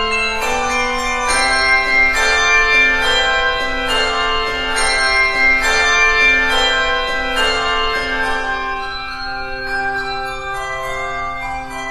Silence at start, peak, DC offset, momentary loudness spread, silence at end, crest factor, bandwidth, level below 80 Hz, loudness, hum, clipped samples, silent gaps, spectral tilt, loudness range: 0 s; -2 dBFS; under 0.1%; 12 LU; 0 s; 14 dB; 13.5 kHz; -30 dBFS; -15 LUFS; none; under 0.1%; none; -1 dB/octave; 8 LU